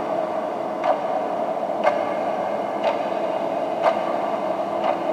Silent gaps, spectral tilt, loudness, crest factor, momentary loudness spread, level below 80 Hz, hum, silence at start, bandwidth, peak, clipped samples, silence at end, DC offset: none; -5.5 dB/octave; -24 LUFS; 18 dB; 3 LU; -76 dBFS; none; 0 s; 14.5 kHz; -4 dBFS; under 0.1%; 0 s; under 0.1%